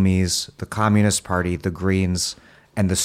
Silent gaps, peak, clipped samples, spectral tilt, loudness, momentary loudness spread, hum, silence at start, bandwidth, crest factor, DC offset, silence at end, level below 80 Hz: none; -6 dBFS; under 0.1%; -4.5 dB/octave; -21 LUFS; 9 LU; none; 0 s; 15 kHz; 16 dB; under 0.1%; 0 s; -44 dBFS